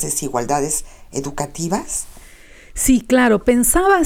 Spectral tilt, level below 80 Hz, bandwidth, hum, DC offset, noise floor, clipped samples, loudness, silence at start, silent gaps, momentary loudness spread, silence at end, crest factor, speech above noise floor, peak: -4 dB/octave; -34 dBFS; 19.5 kHz; none; under 0.1%; -42 dBFS; under 0.1%; -18 LUFS; 0 s; none; 13 LU; 0 s; 14 dB; 25 dB; -2 dBFS